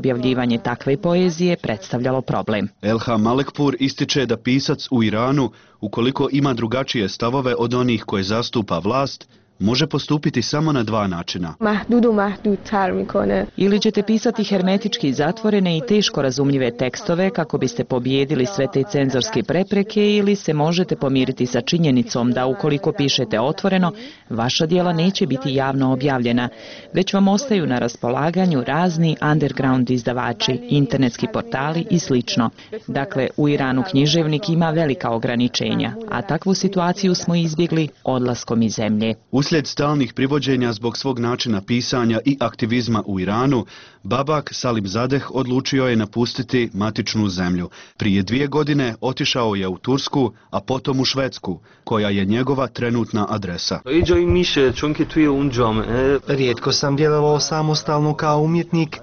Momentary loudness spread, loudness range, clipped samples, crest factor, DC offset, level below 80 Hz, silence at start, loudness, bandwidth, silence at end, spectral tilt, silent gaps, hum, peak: 5 LU; 2 LU; under 0.1%; 14 dB; 0.1%; -46 dBFS; 0 s; -19 LUFS; 6.8 kHz; 0 s; -5 dB/octave; none; none; -6 dBFS